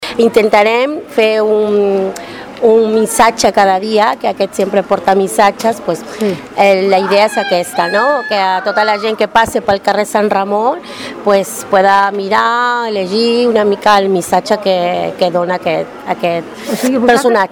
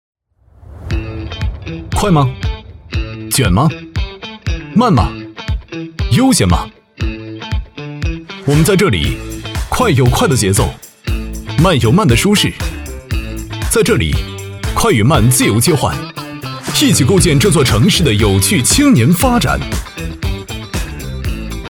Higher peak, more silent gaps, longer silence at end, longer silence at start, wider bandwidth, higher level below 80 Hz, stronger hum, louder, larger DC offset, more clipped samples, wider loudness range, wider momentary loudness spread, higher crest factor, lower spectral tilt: about the same, 0 dBFS vs 0 dBFS; neither; about the same, 0.05 s vs 0 s; second, 0 s vs 0.7 s; about the same, 19.5 kHz vs over 20 kHz; second, -50 dBFS vs -24 dBFS; neither; about the same, -12 LUFS vs -14 LUFS; neither; first, 0.1% vs under 0.1%; second, 2 LU vs 6 LU; second, 8 LU vs 14 LU; about the same, 12 dB vs 14 dB; about the same, -4 dB/octave vs -5 dB/octave